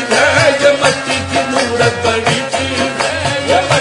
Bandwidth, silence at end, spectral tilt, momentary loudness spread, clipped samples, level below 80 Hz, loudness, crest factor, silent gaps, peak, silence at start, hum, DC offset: 11 kHz; 0 s; -3.5 dB/octave; 6 LU; under 0.1%; -48 dBFS; -13 LUFS; 12 dB; none; 0 dBFS; 0 s; none; under 0.1%